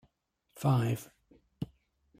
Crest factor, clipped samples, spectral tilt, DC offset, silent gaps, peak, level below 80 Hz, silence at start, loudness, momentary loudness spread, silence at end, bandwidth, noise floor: 18 dB; under 0.1%; -7 dB/octave; under 0.1%; none; -16 dBFS; -66 dBFS; 0.55 s; -33 LUFS; 15 LU; 0.55 s; 15.5 kHz; -76 dBFS